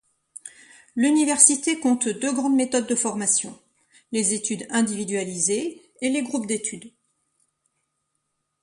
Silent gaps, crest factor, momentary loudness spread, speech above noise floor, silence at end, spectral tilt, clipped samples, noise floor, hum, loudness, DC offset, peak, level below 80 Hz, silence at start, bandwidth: none; 24 dB; 18 LU; 54 dB; 1.75 s; -2.5 dB/octave; under 0.1%; -76 dBFS; none; -22 LUFS; under 0.1%; 0 dBFS; -70 dBFS; 0.45 s; 11.5 kHz